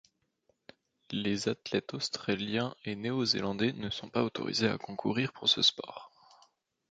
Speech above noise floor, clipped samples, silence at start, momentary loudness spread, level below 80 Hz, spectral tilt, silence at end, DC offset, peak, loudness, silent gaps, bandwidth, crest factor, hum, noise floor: 43 dB; under 0.1%; 1.1 s; 11 LU; -68 dBFS; -4 dB/octave; 0.8 s; under 0.1%; -12 dBFS; -31 LUFS; none; 9.2 kHz; 22 dB; none; -75 dBFS